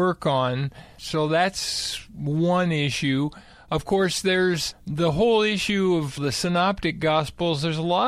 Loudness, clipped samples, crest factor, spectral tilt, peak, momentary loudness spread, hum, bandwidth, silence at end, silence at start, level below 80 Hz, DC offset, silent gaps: -23 LUFS; under 0.1%; 14 dB; -5 dB/octave; -8 dBFS; 8 LU; none; 15 kHz; 0 s; 0 s; -48 dBFS; under 0.1%; none